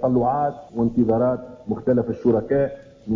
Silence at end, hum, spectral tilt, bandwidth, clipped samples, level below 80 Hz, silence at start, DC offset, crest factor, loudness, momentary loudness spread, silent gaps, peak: 0 s; none; -10.5 dB/octave; 5.8 kHz; under 0.1%; -48 dBFS; 0 s; under 0.1%; 14 dB; -22 LUFS; 8 LU; none; -8 dBFS